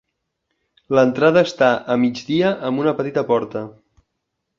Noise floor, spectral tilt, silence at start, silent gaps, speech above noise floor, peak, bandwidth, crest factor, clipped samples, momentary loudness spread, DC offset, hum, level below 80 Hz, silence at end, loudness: -76 dBFS; -6.5 dB/octave; 0.9 s; none; 59 dB; -2 dBFS; 7.4 kHz; 18 dB; under 0.1%; 7 LU; under 0.1%; none; -60 dBFS; 0.9 s; -18 LUFS